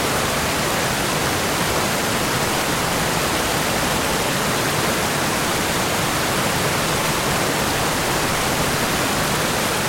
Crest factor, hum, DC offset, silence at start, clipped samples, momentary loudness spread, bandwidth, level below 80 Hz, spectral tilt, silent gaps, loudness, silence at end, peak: 14 dB; none; under 0.1%; 0 s; under 0.1%; 0 LU; 16.5 kHz; -38 dBFS; -3 dB/octave; none; -19 LUFS; 0 s; -6 dBFS